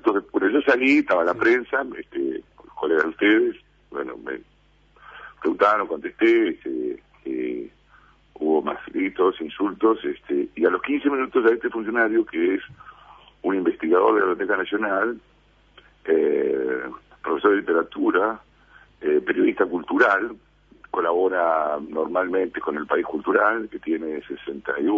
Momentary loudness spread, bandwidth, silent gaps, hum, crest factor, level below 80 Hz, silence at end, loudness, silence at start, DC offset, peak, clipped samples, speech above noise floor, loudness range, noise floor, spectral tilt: 13 LU; 7.2 kHz; none; 50 Hz at -60 dBFS; 20 dB; -60 dBFS; 0 s; -22 LUFS; 0.05 s; under 0.1%; -4 dBFS; under 0.1%; 37 dB; 3 LU; -58 dBFS; -6.5 dB/octave